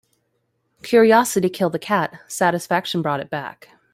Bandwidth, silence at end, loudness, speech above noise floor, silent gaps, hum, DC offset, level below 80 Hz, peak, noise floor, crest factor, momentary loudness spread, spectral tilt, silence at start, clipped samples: 16 kHz; 0.45 s; -19 LUFS; 51 dB; none; none; under 0.1%; -64 dBFS; -2 dBFS; -70 dBFS; 18 dB; 15 LU; -4.5 dB/octave; 0.85 s; under 0.1%